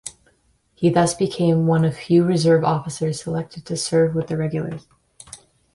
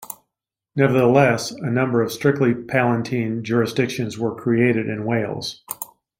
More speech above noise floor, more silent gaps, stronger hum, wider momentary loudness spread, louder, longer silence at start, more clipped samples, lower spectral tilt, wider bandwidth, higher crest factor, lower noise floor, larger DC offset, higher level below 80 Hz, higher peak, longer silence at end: second, 43 dB vs 64 dB; neither; neither; first, 17 LU vs 14 LU; about the same, -20 LUFS vs -20 LUFS; about the same, 0.05 s vs 0 s; neither; about the same, -6 dB/octave vs -6 dB/octave; second, 11.5 kHz vs 16.5 kHz; about the same, 16 dB vs 18 dB; second, -62 dBFS vs -83 dBFS; neither; first, -54 dBFS vs -60 dBFS; about the same, -4 dBFS vs -2 dBFS; about the same, 0.4 s vs 0.35 s